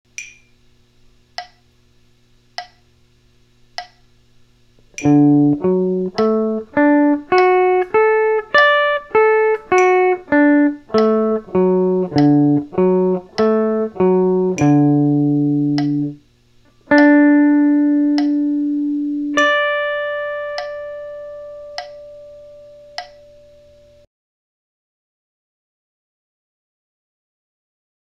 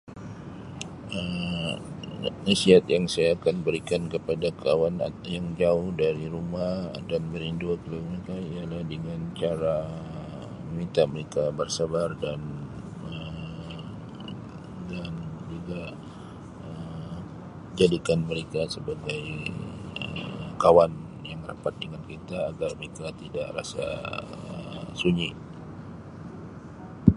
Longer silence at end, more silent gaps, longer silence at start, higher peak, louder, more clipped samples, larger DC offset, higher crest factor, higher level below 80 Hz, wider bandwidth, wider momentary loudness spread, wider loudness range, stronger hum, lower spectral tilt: first, 5 s vs 0 s; neither; first, 0.2 s vs 0.05 s; about the same, 0 dBFS vs 0 dBFS; first, -15 LUFS vs -28 LUFS; neither; neither; second, 16 dB vs 28 dB; second, -56 dBFS vs -50 dBFS; second, 7.6 kHz vs 11.5 kHz; first, 20 LU vs 17 LU; first, 17 LU vs 13 LU; neither; about the same, -7 dB/octave vs -6 dB/octave